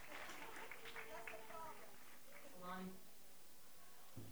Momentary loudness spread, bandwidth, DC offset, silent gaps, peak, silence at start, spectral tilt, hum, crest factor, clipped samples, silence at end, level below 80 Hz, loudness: 10 LU; over 20 kHz; 0.2%; none; -36 dBFS; 0 s; -3.5 dB/octave; none; 18 dB; under 0.1%; 0 s; -78 dBFS; -56 LUFS